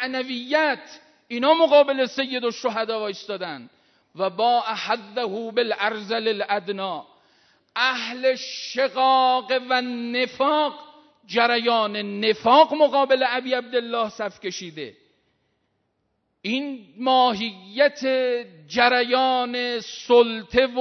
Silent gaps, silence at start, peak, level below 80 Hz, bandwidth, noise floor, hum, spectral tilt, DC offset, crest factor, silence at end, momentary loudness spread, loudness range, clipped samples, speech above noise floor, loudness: none; 0 s; -2 dBFS; -64 dBFS; 6.4 kHz; -73 dBFS; none; -3.5 dB/octave; under 0.1%; 20 dB; 0 s; 13 LU; 6 LU; under 0.1%; 51 dB; -22 LUFS